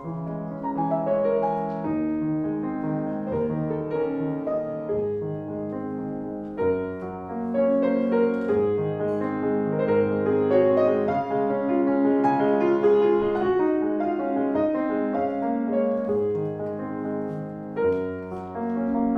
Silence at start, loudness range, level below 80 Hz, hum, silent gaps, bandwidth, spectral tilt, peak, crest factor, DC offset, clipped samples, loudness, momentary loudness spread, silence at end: 0 s; 6 LU; -56 dBFS; none; none; 5.4 kHz; -10 dB/octave; -8 dBFS; 16 dB; under 0.1%; under 0.1%; -25 LUFS; 10 LU; 0 s